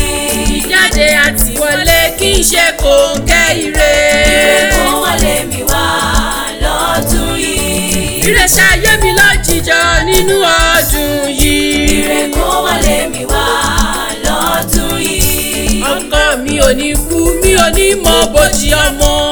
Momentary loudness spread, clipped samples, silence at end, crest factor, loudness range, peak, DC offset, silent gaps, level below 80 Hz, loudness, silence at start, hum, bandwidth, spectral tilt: 6 LU; 0.3%; 0 s; 10 dB; 4 LU; 0 dBFS; under 0.1%; none; -18 dBFS; -10 LUFS; 0 s; none; over 20 kHz; -2.5 dB/octave